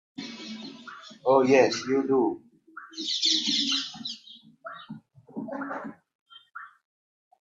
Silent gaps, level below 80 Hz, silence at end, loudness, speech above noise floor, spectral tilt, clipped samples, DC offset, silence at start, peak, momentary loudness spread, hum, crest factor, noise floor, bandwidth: 6.15-6.26 s; -74 dBFS; 0.8 s; -25 LUFS; 27 dB; -3 dB/octave; under 0.1%; under 0.1%; 0.2 s; -6 dBFS; 23 LU; none; 22 dB; -51 dBFS; 7.8 kHz